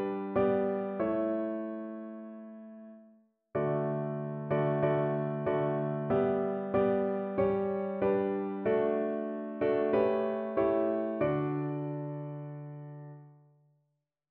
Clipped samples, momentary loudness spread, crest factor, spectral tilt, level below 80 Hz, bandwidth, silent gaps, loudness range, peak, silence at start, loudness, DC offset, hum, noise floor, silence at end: under 0.1%; 15 LU; 16 dB; -8 dB/octave; -64 dBFS; 4.3 kHz; none; 6 LU; -16 dBFS; 0 s; -31 LUFS; under 0.1%; none; -80 dBFS; 1 s